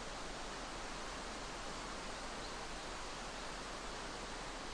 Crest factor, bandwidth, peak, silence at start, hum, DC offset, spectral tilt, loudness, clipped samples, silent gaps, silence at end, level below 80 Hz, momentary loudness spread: 12 dB; 10.5 kHz; -32 dBFS; 0 s; none; under 0.1%; -2.5 dB/octave; -45 LUFS; under 0.1%; none; 0 s; -54 dBFS; 0 LU